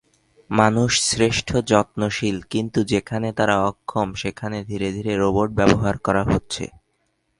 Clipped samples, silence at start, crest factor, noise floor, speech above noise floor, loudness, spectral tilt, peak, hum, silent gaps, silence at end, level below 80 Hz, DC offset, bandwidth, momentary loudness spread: under 0.1%; 0.5 s; 20 dB; -69 dBFS; 49 dB; -21 LUFS; -4.5 dB/octave; 0 dBFS; none; none; 0.75 s; -42 dBFS; under 0.1%; 11.5 kHz; 9 LU